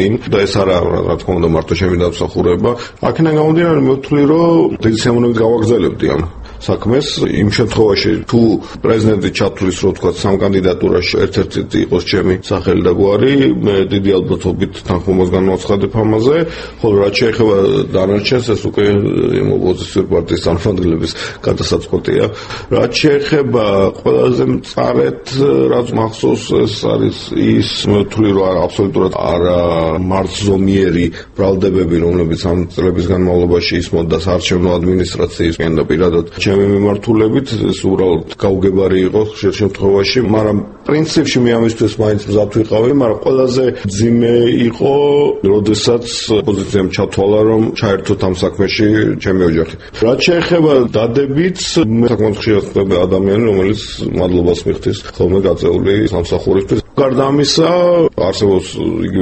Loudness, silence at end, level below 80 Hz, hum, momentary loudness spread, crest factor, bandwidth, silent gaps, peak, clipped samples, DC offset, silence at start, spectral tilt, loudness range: -13 LUFS; 0 s; -34 dBFS; none; 5 LU; 12 dB; 8.8 kHz; none; 0 dBFS; under 0.1%; under 0.1%; 0 s; -6.5 dB/octave; 2 LU